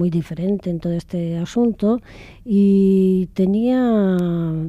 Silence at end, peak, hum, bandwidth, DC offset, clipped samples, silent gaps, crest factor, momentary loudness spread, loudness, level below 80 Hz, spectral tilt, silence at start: 0 s; -8 dBFS; none; 7.8 kHz; under 0.1%; under 0.1%; none; 10 dB; 9 LU; -19 LUFS; -46 dBFS; -9 dB/octave; 0 s